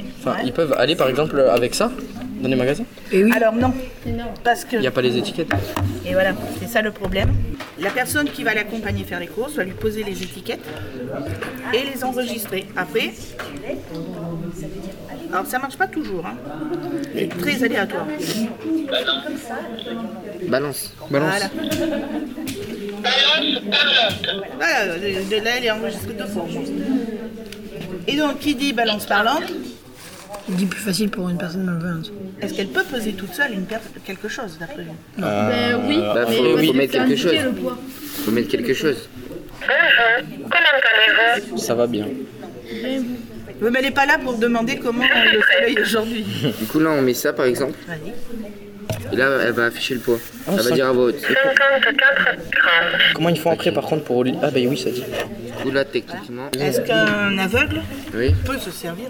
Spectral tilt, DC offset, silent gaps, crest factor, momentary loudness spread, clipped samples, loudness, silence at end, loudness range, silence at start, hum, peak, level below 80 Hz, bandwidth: -4.5 dB/octave; under 0.1%; none; 20 dB; 16 LU; under 0.1%; -20 LUFS; 0 s; 9 LU; 0 s; none; 0 dBFS; -42 dBFS; over 20 kHz